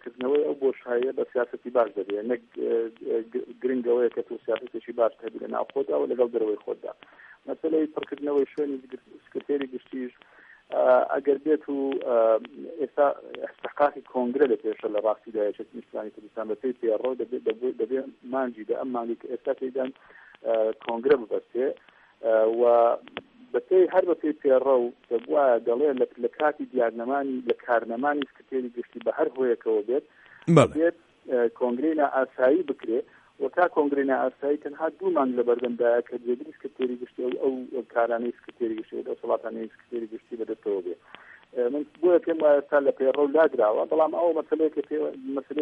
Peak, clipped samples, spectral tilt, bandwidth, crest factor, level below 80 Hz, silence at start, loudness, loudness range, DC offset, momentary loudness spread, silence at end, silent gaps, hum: -4 dBFS; under 0.1%; -7.5 dB/octave; 9.4 kHz; 22 dB; -72 dBFS; 0.05 s; -26 LUFS; 7 LU; under 0.1%; 14 LU; 0 s; none; none